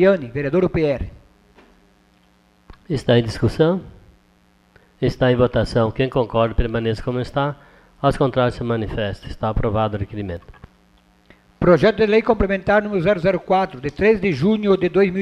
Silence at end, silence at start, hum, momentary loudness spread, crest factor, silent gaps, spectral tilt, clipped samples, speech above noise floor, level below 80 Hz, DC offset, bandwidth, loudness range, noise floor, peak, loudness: 0 s; 0 s; none; 10 LU; 18 dB; none; -7.5 dB/octave; under 0.1%; 38 dB; -36 dBFS; under 0.1%; 11.5 kHz; 6 LU; -57 dBFS; -2 dBFS; -19 LUFS